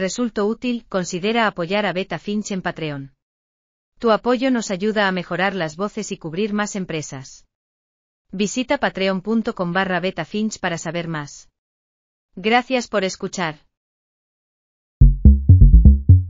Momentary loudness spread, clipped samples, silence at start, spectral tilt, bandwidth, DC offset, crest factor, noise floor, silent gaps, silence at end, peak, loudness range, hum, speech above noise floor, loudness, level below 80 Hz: 14 LU; under 0.1%; 0 s; -6 dB/octave; 7.6 kHz; under 0.1%; 18 dB; under -90 dBFS; 3.22-3.92 s, 7.55-8.25 s, 11.59-12.29 s, 13.77-15.00 s; 0 s; 0 dBFS; 5 LU; none; over 68 dB; -20 LUFS; -22 dBFS